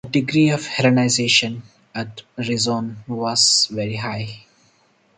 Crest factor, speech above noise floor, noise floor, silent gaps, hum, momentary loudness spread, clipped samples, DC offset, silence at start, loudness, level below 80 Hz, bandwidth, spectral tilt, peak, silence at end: 18 dB; 39 dB; -59 dBFS; none; none; 16 LU; under 0.1%; under 0.1%; 0.05 s; -18 LUFS; -58 dBFS; 9.6 kHz; -3.5 dB/octave; -2 dBFS; 0.8 s